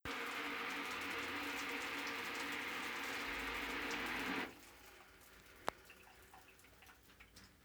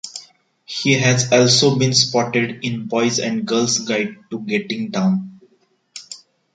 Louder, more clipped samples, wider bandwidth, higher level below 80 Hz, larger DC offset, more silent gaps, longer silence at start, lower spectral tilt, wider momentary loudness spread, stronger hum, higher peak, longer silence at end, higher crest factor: second, -42 LUFS vs -17 LUFS; neither; first, over 20 kHz vs 9.4 kHz; second, -68 dBFS vs -60 dBFS; neither; neither; about the same, 0.05 s vs 0.05 s; second, -2 dB/octave vs -4 dB/octave; about the same, 20 LU vs 21 LU; neither; second, -18 dBFS vs -2 dBFS; second, 0 s vs 0.35 s; first, 28 dB vs 18 dB